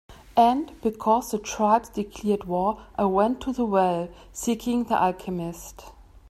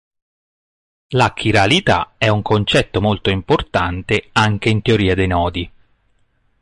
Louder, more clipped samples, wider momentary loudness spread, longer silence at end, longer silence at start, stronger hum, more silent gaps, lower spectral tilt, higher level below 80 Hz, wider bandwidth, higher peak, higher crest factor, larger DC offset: second, -25 LUFS vs -16 LUFS; neither; first, 10 LU vs 6 LU; second, 0.25 s vs 0.9 s; second, 0.1 s vs 1.1 s; neither; neither; about the same, -5.5 dB/octave vs -5.5 dB/octave; second, -50 dBFS vs -34 dBFS; first, 15.5 kHz vs 11.5 kHz; second, -6 dBFS vs -2 dBFS; about the same, 18 dB vs 16 dB; neither